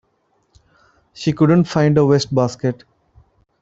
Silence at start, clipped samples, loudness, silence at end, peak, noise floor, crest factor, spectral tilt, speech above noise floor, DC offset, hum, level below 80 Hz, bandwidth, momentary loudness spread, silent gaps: 1.2 s; under 0.1%; -16 LUFS; 0.85 s; -2 dBFS; -64 dBFS; 16 dB; -7 dB/octave; 49 dB; under 0.1%; none; -52 dBFS; 8 kHz; 10 LU; none